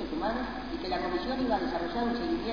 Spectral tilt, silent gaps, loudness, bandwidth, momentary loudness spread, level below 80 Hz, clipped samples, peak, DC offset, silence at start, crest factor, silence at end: -6.5 dB/octave; none; -32 LUFS; 5.2 kHz; 5 LU; -48 dBFS; under 0.1%; -16 dBFS; 0.4%; 0 s; 16 dB; 0 s